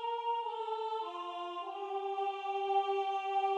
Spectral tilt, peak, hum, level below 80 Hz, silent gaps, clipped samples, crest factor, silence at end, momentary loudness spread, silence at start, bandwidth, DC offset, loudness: -1.5 dB/octave; -22 dBFS; none; under -90 dBFS; none; under 0.1%; 14 dB; 0 s; 8 LU; 0 s; 8.4 kHz; under 0.1%; -36 LUFS